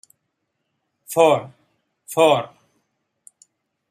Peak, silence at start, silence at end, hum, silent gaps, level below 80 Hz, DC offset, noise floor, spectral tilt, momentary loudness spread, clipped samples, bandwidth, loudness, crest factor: -2 dBFS; 1.1 s; 1.45 s; none; none; -72 dBFS; under 0.1%; -75 dBFS; -4 dB/octave; 11 LU; under 0.1%; 15 kHz; -18 LUFS; 20 dB